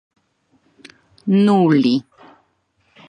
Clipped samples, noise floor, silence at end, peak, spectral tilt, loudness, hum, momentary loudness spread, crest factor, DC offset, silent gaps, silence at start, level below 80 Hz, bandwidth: under 0.1%; -64 dBFS; 1.1 s; -4 dBFS; -8 dB/octave; -16 LUFS; none; 9 LU; 16 dB; under 0.1%; none; 1.25 s; -68 dBFS; 9.4 kHz